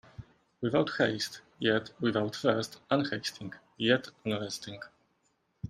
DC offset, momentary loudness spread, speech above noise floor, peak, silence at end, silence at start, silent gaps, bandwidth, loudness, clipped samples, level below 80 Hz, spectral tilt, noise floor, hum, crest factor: under 0.1%; 17 LU; 43 dB; -10 dBFS; 0 s; 0.2 s; none; 15.5 kHz; -31 LUFS; under 0.1%; -66 dBFS; -5 dB/octave; -74 dBFS; none; 22 dB